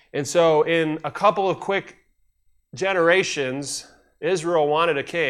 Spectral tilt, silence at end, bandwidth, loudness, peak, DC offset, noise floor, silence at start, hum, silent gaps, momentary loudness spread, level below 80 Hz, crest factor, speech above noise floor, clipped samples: -4 dB/octave; 0 s; 13.5 kHz; -21 LUFS; -4 dBFS; under 0.1%; -63 dBFS; 0.15 s; none; none; 11 LU; -64 dBFS; 18 dB; 42 dB; under 0.1%